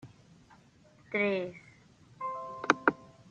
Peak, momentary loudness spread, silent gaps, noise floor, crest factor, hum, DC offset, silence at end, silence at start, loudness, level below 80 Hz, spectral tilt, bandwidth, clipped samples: -6 dBFS; 16 LU; none; -61 dBFS; 30 dB; none; under 0.1%; 0.25 s; 0.05 s; -32 LUFS; -74 dBFS; -5 dB/octave; 9 kHz; under 0.1%